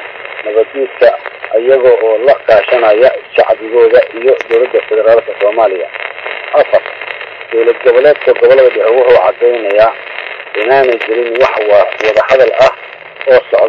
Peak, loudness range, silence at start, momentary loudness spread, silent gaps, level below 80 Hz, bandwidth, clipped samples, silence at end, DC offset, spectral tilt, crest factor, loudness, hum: 0 dBFS; 3 LU; 0 s; 13 LU; none; -50 dBFS; 7 kHz; 0.9%; 0 s; under 0.1%; -5 dB/octave; 10 dB; -9 LUFS; none